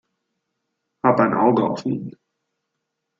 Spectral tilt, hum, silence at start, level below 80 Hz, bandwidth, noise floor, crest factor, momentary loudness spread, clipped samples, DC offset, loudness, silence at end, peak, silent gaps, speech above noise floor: -8 dB/octave; none; 1.05 s; -62 dBFS; 7.6 kHz; -79 dBFS; 20 dB; 12 LU; under 0.1%; under 0.1%; -20 LUFS; 1.1 s; -2 dBFS; none; 59 dB